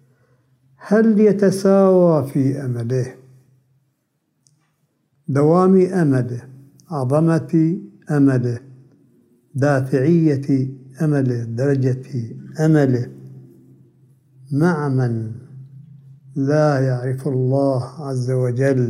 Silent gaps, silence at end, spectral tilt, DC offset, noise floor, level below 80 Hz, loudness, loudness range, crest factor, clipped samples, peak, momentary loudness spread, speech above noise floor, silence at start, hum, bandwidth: none; 0 s; -8.5 dB/octave; under 0.1%; -69 dBFS; -66 dBFS; -18 LUFS; 5 LU; 16 dB; under 0.1%; -4 dBFS; 14 LU; 52 dB; 0.8 s; none; 12 kHz